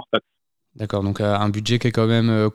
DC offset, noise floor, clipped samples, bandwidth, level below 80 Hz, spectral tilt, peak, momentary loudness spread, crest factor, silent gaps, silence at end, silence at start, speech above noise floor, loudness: under 0.1%; -80 dBFS; under 0.1%; 12 kHz; -54 dBFS; -6.5 dB/octave; -4 dBFS; 7 LU; 18 dB; none; 0 s; 0 s; 60 dB; -21 LUFS